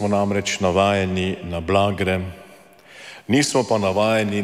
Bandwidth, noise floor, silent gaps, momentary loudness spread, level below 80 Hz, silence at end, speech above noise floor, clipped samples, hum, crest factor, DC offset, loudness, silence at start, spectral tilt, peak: 15.5 kHz; -47 dBFS; none; 12 LU; -48 dBFS; 0 s; 27 dB; under 0.1%; none; 16 dB; under 0.1%; -20 LUFS; 0 s; -5 dB/octave; -4 dBFS